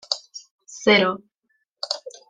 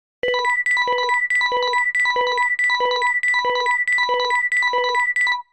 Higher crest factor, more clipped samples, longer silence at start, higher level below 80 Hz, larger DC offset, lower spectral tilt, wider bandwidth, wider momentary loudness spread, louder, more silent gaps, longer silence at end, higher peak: first, 22 dB vs 10 dB; neither; second, 0.1 s vs 0.25 s; about the same, -70 dBFS vs -66 dBFS; second, under 0.1% vs 0.2%; first, -3.5 dB/octave vs 0.5 dB/octave; second, 9.6 kHz vs 12.5 kHz; first, 24 LU vs 1 LU; second, -21 LUFS vs -18 LUFS; first, 0.51-0.59 s vs none; about the same, 0.2 s vs 0.1 s; first, -4 dBFS vs -8 dBFS